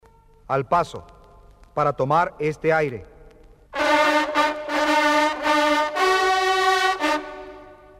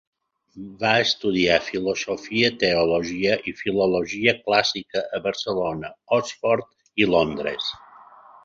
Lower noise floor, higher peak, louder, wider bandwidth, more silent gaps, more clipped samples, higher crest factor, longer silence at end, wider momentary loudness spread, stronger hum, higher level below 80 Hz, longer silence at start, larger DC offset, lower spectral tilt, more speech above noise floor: about the same, -49 dBFS vs -48 dBFS; about the same, -4 dBFS vs -4 dBFS; about the same, -21 LUFS vs -22 LUFS; first, 16 kHz vs 7.8 kHz; neither; neither; about the same, 18 dB vs 20 dB; second, 0.25 s vs 0.45 s; first, 13 LU vs 9 LU; neither; about the same, -52 dBFS vs -54 dBFS; about the same, 0.5 s vs 0.55 s; neither; about the same, -4 dB/octave vs -4 dB/octave; about the same, 27 dB vs 25 dB